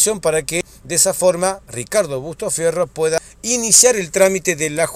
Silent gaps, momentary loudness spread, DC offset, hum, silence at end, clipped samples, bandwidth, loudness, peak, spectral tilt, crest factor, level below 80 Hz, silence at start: none; 12 LU; under 0.1%; none; 0 s; under 0.1%; 16 kHz; -16 LUFS; 0 dBFS; -2 dB/octave; 18 dB; -48 dBFS; 0 s